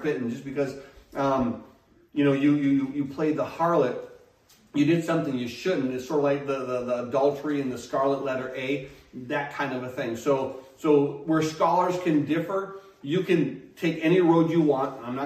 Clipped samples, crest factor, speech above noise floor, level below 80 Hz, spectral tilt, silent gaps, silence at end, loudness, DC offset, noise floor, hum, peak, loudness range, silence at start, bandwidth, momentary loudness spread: under 0.1%; 16 dB; 33 dB; -62 dBFS; -7 dB/octave; none; 0 s; -26 LUFS; under 0.1%; -58 dBFS; none; -8 dBFS; 4 LU; 0 s; 14 kHz; 9 LU